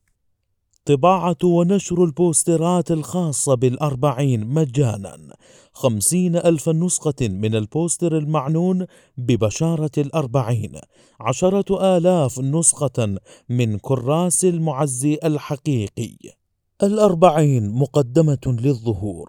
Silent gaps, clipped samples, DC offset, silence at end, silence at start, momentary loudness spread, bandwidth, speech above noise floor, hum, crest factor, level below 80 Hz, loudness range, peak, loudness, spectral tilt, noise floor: none; under 0.1%; under 0.1%; 0.05 s; 0.85 s; 8 LU; 18 kHz; 50 dB; none; 20 dB; -52 dBFS; 3 LU; 0 dBFS; -19 LUFS; -6 dB/octave; -69 dBFS